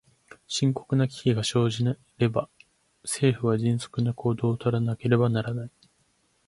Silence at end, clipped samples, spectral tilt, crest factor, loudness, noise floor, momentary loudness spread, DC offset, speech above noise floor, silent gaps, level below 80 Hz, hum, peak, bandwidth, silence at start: 0.8 s; under 0.1%; -6 dB/octave; 20 dB; -26 LUFS; -68 dBFS; 9 LU; under 0.1%; 43 dB; none; -58 dBFS; none; -6 dBFS; 11.5 kHz; 0.5 s